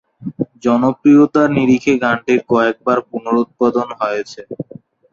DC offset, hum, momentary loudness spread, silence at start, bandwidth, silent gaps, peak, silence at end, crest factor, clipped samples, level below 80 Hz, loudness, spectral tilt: under 0.1%; none; 19 LU; 0.2 s; 7.2 kHz; none; -2 dBFS; 0.5 s; 14 dB; under 0.1%; -54 dBFS; -15 LUFS; -6.5 dB/octave